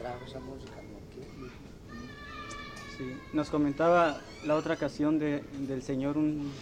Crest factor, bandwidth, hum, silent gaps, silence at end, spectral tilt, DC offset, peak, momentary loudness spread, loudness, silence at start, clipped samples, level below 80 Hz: 18 dB; 9.8 kHz; none; none; 0 s; -6.5 dB/octave; under 0.1%; -14 dBFS; 20 LU; -31 LUFS; 0 s; under 0.1%; -54 dBFS